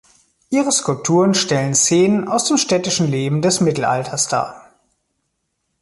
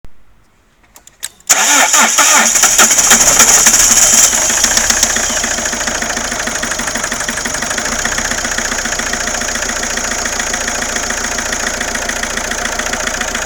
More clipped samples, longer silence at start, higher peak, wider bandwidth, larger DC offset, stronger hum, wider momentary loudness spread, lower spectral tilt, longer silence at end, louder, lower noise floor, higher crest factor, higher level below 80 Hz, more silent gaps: second, under 0.1% vs 0.2%; first, 0.5 s vs 0.05 s; about the same, -2 dBFS vs 0 dBFS; second, 11.5 kHz vs over 20 kHz; neither; neither; second, 5 LU vs 11 LU; first, -4 dB/octave vs 0 dB/octave; first, 1.25 s vs 0 s; second, -16 LUFS vs -10 LUFS; first, -72 dBFS vs -51 dBFS; about the same, 16 dB vs 14 dB; second, -56 dBFS vs -32 dBFS; neither